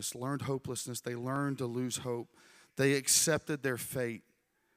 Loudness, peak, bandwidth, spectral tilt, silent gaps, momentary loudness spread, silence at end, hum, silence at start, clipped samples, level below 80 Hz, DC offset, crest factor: -33 LUFS; -14 dBFS; 16 kHz; -3.5 dB/octave; none; 14 LU; 0.55 s; none; 0 s; under 0.1%; -70 dBFS; under 0.1%; 20 dB